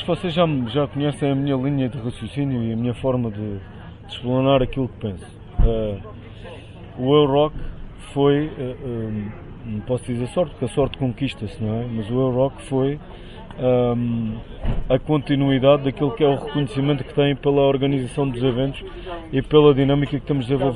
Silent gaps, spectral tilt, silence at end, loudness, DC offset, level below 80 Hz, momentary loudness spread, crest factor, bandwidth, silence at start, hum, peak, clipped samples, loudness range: none; -8 dB/octave; 0 s; -21 LUFS; under 0.1%; -34 dBFS; 16 LU; 18 dB; 11 kHz; 0 s; none; -2 dBFS; under 0.1%; 5 LU